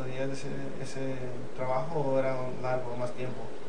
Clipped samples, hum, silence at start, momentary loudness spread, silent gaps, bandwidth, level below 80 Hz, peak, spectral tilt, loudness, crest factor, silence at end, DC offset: under 0.1%; none; 0 s; 9 LU; none; 10 kHz; -58 dBFS; -14 dBFS; -6.5 dB/octave; -34 LUFS; 18 dB; 0 s; 3%